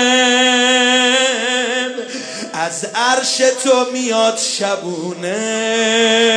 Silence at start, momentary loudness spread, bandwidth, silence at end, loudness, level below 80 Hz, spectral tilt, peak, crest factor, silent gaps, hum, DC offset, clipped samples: 0 s; 11 LU; 11 kHz; 0 s; -14 LUFS; -72 dBFS; -1.5 dB/octave; -2 dBFS; 14 dB; none; none; under 0.1%; under 0.1%